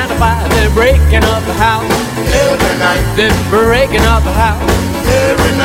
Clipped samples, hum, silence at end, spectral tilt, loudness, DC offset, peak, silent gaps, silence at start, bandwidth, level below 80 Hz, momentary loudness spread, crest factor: under 0.1%; none; 0 s; -5 dB/octave; -11 LUFS; under 0.1%; 0 dBFS; none; 0 s; 16.5 kHz; -16 dBFS; 4 LU; 10 dB